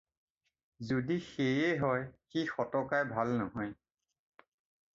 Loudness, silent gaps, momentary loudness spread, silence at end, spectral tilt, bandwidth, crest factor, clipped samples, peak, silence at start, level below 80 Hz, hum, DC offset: -34 LUFS; none; 9 LU; 1.2 s; -5 dB/octave; 7.6 kHz; 18 dB; under 0.1%; -18 dBFS; 0.8 s; -68 dBFS; none; under 0.1%